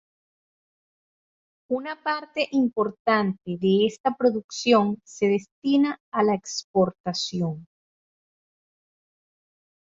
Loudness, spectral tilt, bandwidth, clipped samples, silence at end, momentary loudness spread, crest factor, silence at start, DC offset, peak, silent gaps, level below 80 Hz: -24 LUFS; -5.5 dB/octave; 7.8 kHz; under 0.1%; 2.3 s; 8 LU; 20 dB; 1.7 s; under 0.1%; -6 dBFS; 3.00-3.05 s, 4.00-4.04 s, 4.44-4.49 s, 5.51-5.62 s, 6.00-6.12 s, 6.64-6.74 s, 7.00-7.04 s; -68 dBFS